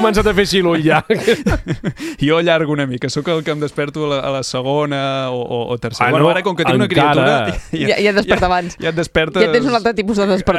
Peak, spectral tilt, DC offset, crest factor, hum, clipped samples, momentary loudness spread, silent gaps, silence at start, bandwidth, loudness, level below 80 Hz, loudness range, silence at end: 0 dBFS; -5.5 dB/octave; under 0.1%; 16 dB; none; under 0.1%; 8 LU; none; 0 s; 14.5 kHz; -16 LUFS; -34 dBFS; 4 LU; 0 s